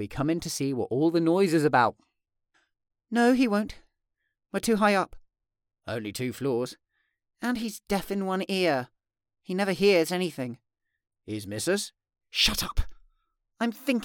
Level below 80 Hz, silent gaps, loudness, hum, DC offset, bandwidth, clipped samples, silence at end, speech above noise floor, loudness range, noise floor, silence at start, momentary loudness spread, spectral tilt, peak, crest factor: -46 dBFS; none; -27 LUFS; none; under 0.1%; 19 kHz; under 0.1%; 0 s; 55 dB; 5 LU; -81 dBFS; 0 s; 14 LU; -4.5 dB/octave; -8 dBFS; 20 dB